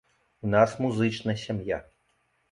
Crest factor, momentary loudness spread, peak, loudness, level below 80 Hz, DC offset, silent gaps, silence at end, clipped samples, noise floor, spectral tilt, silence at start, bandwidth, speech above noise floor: 20 dB; 11 LU; -8 dBFS; -27 LUFS; -56 dBFS; under 0.1%; none; 0.7 s; under 0.1%; -71 dBFS; -6.5 dB/octave; 0.45 s; 11 kHz; 45 dB